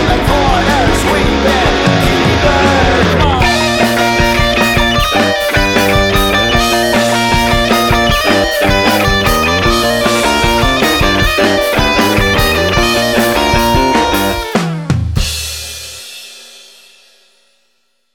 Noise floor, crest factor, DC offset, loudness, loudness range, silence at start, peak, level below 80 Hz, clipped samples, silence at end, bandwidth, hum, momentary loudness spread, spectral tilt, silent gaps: -62 dBFS; 12 dB; under 0.1%; -11 LUFS; 5 LU; 0 s; 0 dBFS; -22 dBFS; under 0.1%; 1.55 s; 19 kHz; none; 6 LU; -4 dB/octave; none